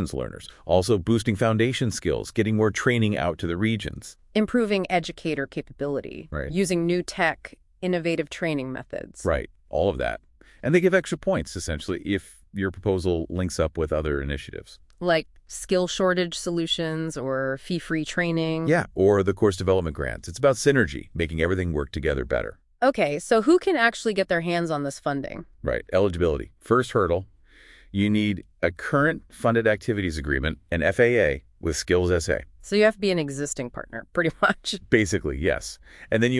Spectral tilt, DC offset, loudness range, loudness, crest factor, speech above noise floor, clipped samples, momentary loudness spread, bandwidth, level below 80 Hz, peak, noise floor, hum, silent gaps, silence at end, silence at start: -5.5 dB/octave; under 0.1%; 4 LU; -24 LUFS; 20 dB; 28 dB; under 0.1%; 11 LU; 12 kHz; -44 dBFS; -4 dBFS; -52 dBFS; none; none; 0 s; 0 s